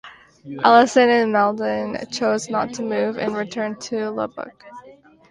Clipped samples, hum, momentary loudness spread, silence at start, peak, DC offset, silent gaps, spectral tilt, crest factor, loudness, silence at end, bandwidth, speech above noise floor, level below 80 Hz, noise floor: under 0.1%; none; 13 LU; 0.05 s; 0 dBFS; under 0.1%; none; -4 dB/octave; 20 dB; -20 LUFS; 0.4 s; 11 kHz; 28 dB; -62 dBFS; -48 dBFS